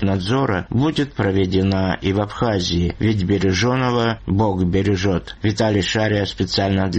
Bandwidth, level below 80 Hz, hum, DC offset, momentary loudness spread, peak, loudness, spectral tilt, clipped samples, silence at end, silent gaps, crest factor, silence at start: 8.6 kHz; -38 dBFS; none; under 0.1%; 3 LU; -6 dBFS; -19 LUFS; -6 dB/octave; under 0.1%; 0 s; none; 12 dB; 0 s